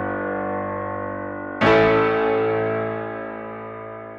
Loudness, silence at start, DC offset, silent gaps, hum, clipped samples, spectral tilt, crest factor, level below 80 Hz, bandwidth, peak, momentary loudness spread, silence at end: -22 LUFS; 0 s; under 0.1%; none; none; under 0.1%; -7 dB/octave; 16 dB; -50 dBFS; 7.4 kHz; -6 dBFS; 17 LU; 0 s